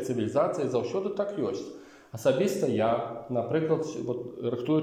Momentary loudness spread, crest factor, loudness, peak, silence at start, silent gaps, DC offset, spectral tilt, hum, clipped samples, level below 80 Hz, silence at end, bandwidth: 8 LU; 16 dB; -29 LUFS; -12 dBFS; 0 s; none; under 0.1%; -6.5 dB/octave; none; under 0.1%; -68 dBFS; 0 s; 16 kHz